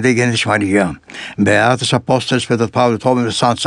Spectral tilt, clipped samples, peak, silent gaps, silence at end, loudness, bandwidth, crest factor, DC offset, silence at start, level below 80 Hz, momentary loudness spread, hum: -5 dB/octave; under 0.1%; 0 dBFS; none; 0 s; -15 LUFS; 11.5 kHz; 14 dB; under 0.1%; 0 s; -50 dBFS; 5 LU; none